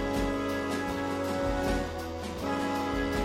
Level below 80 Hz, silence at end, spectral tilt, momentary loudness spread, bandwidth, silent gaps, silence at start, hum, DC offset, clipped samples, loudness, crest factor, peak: -42 dBFS; 0 s; -5.5 dB/octave; 5 LU; 16 kHz; none; 0 s; none; under 0.1%; under 0.1%; -31 LUFS; 14 dB; -18 dBFS